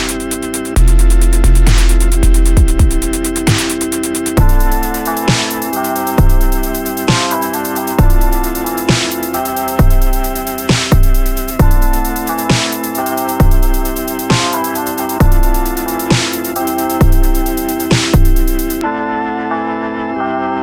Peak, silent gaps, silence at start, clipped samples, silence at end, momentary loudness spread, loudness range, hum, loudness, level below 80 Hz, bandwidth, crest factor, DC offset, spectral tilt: 0 dBFS; none; 0 s; under 0.1%; 0 s; 6 LU; 2 LU; none; -14 LUFS; -12 dBFS; 17.5 kHz; 12 dB; under 0.1%; -5 dB/octave